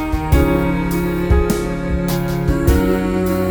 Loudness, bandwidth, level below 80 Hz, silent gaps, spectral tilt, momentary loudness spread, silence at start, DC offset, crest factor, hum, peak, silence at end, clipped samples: -17 LUFS; over 20 kHz; -22 dBFS; none; -7 dB/octave; 4 LU; 0 s; under 0.1%; 14 dB; none; 0 dBFS; 0 s; under 0.1%